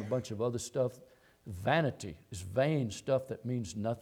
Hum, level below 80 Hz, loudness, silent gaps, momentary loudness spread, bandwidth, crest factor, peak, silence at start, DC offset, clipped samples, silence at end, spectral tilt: none; -64 dBFS; -34 LUFS; none; 14 LU; 16.5 kHz; 20 dB; -16 dBFS; 0 s; under 0.1%; under 0.1%; 0 s; -6 dB/octave